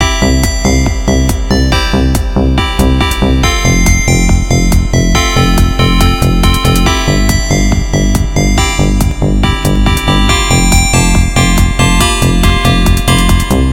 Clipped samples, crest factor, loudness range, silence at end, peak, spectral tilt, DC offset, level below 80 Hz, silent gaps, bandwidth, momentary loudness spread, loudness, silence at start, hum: 0.4%; 8 dB; 2 LU; 0 s; 0 dBFS; -4.5 dB/octave; under 0.1%; -12 dBFS; none; 17 kHz; 3 LU; -10 LUFS; 0 s; none